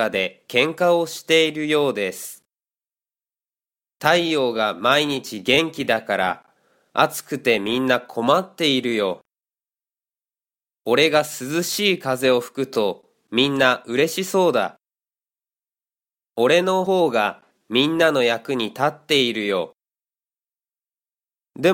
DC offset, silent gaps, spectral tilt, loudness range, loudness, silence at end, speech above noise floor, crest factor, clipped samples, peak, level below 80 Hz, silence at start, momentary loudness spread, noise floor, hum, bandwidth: under 0.1%; none; -4 dB/octave; 3 LU; -20 LUFS; 0 s; over 70 dB; 20 dB; under 0.1%; -2 dBFS; -64 dBFS; 0 s; 8 LU; under -90 dBFS; none; 17 kHz